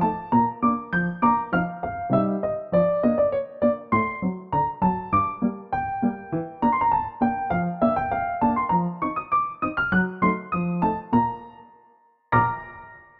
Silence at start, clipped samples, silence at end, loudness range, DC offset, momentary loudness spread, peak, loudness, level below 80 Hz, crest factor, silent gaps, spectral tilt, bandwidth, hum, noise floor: 0 s; under 0.1%; 0.2 s; 2 LU; under 0.1%; 7 LU; -6 dBFS; -24 LUFS; -50 dBFS; 18 dB; none; -11 dB/octave; 4.5 kHz; none; -59 dBFS